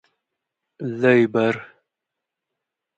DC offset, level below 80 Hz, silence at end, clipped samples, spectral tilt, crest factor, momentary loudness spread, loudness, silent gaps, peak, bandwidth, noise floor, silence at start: under 0.1%; -70 dBFS; 1.35 s; under 0.1%; -7.5 dB/octave; 20 dB; 15 LU; -20 LUFS; none; -4 dBFS; 8 kHz; -84 dBFS; 0.8 s